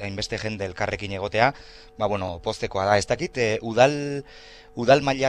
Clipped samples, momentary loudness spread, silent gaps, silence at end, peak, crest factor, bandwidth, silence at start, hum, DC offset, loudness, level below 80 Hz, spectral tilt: under 0.1%; 11 LU; none; 0 s; -2 dBFS; 22 dB; 11 kHz; 0 s; none; under 0.1%; -24 LUFS; -48 dBFS; -5 dB/octave